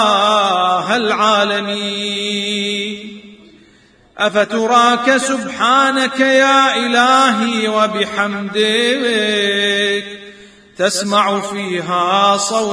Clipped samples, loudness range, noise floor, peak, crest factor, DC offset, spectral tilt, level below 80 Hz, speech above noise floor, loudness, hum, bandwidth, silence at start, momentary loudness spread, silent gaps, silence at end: under 0.1%; 5 LU; -49 dBFS; 0 dBFS; 16 dB; under 0.1%; -3 dB/octave; -60 dBFS; 34 dB; -14 LUFS; none; 11 kHz; 0 s; 8 LU; none; 0 s